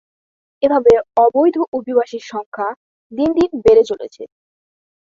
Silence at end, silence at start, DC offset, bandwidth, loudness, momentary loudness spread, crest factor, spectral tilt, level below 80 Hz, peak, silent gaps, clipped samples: 0.85 s; 0.6 s; under 0.1%; 7.4 kHz; -15 LUFS; 15 LU; 16 dB; -6.5 dB/octave; -48 dBFS; -2 dBFS; 1.68-1.72 s, 2.46-2.52 s, 2.76-3.10 s; under 0.1%